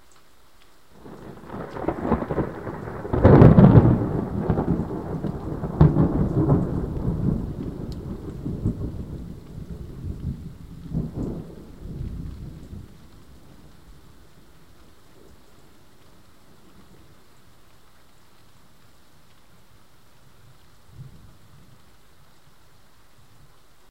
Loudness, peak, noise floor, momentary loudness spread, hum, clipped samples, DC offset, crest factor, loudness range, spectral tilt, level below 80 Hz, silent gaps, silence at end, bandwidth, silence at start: -22 LUFS; 0 dBFS; -56 dBFS; 25 LU; none; under 0.1%; 0.4%; 24 dB; 19 LU; -10 dB/octave; -36 dBFS; none; 2.85 s; 8.4 kHz; 1.05 s